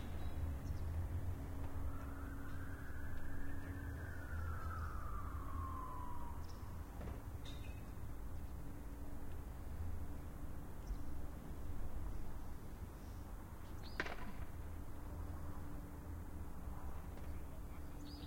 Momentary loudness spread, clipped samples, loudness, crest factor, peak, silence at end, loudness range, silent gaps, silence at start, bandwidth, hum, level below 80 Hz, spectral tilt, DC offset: 7 LU; under 0.1%; -49 LUFS; 20 dB; -24 dBFS; 0 s; 4 LU; none; 0 s; 16.5 kHz; none; -50 dBFS; -6.5 dB/octave; under 0.1%